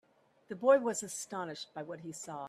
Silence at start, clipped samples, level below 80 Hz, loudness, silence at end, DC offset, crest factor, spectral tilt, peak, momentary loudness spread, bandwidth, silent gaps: 0.5 s; under 0.1%; -82 dBFS; -34 LUFS; 0 s; under 0.1%; 20 dB; -3.5 dB/octave; -14 dBFS; 16 LU; 13.5 kHz; none